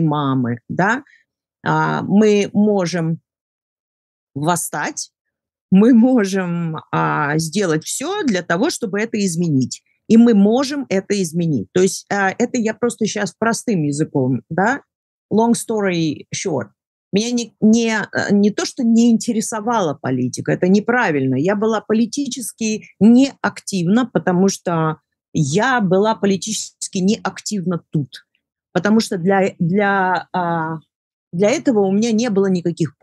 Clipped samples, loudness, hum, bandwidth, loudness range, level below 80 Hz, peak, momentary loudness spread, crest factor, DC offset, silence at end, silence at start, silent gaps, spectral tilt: under 0.1%; -18 LUFS; none; 12.5 kHz; 3 LU; -66 dBFS; -2 dBFS; 9 LU; 16 dB; under 0.1%; 0.15 s; 0 s; 3.41-4.27 s, 5.21-5.25 s, 5.61-5.69 s, 14.95-15.29 s, 16.87-17.11 s, 25.28-25.32 s, 30.95-31.31 s; -5.5 dB/octave